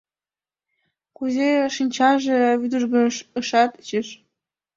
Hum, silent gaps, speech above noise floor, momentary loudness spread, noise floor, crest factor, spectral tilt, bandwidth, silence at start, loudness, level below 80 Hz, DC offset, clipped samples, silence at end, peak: none; none; over 70 dB; 9 LU; under -90 dBFS; 18 dB; -3.5 dB/octave; 7.6 kHz; 1.2 s; -21 LUFS; -68 dBFS; under 0.1%; under 0.1%; 0.65 s; -4 dBFS